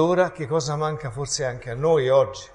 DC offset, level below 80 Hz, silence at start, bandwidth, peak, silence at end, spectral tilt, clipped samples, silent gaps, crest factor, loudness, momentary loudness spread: under 0.1%; -50 dBFS; 0 s; 11 kHz; -6 dBFS; 0.05 s; -5 dB/octave; under 0.1%; none; 16 dB; -23 LUFS; 9 LU